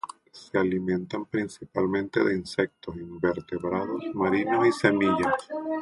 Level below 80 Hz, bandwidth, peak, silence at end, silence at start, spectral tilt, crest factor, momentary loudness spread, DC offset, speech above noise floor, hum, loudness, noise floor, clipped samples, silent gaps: -58 dBFS; 11.5 kHz; -4 dBFS; 0 s; 0.05 s; -6.5 dB/octave; 22 dB; 9 LU; under 0.1%; 20 dB; none; -27 LUFS; -46 dBFS; under 0.1%; none